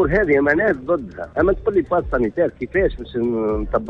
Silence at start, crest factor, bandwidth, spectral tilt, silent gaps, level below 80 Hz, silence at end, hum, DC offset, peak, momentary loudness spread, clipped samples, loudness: 0 s; 14 dB; 6 kHz; -9 dB/octave; none; -34 dBFS; 0 s; none; under 0.1%; -4 dBFS; 7 LU; under 0.1%; -20 LUFS